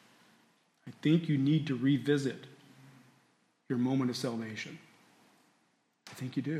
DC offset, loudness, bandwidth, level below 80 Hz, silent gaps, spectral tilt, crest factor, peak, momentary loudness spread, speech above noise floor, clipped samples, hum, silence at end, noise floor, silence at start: under 0.1%; -32 LUFS; 13.5 kHz; -80 dBFS; none; -7 dB/octave; 18 dB; -16 dBFS; 23 LU; 43 dB; under 0.1%; none; 0 s; -74 dBFS; 0.85 s